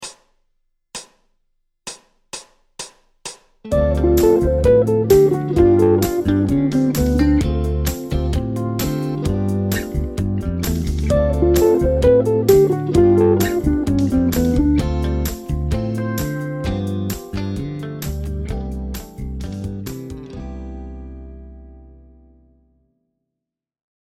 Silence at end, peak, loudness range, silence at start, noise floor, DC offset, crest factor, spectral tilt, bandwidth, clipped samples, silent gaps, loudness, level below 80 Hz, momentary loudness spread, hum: 2.2 s; 0 dBFS; 17 LU; 0 s; -84 dBFS; under 0.1%; 18 dB; -7 dB/octave; 16 kHz; under 0.1%; none; -18 LUFS; -28 dBFS; 20 LU; none